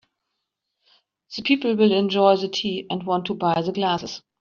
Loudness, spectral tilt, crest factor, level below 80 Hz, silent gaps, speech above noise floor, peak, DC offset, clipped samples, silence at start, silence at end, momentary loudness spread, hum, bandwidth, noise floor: -21 LUFS; -3.5 dB/octave; 18 dB; -66 dBFS; none; 58 dB; -4 dBFS; under 0.1%; under 0.1%; 1.3 s; 0.25 s; 10 LU; none; 7.2 kHz; -80 dBFS